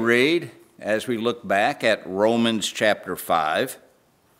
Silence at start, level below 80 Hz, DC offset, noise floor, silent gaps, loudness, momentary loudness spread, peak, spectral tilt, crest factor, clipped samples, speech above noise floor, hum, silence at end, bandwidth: 0 s; -68 dBFS; under 0.1%; -60 dBFS; none; -22 LUFS; 9 LU; -4 dBFS; -4 dB/octave; 20 dB; under 0.1%; 38 dB; none; 0.6 s; 16 kHz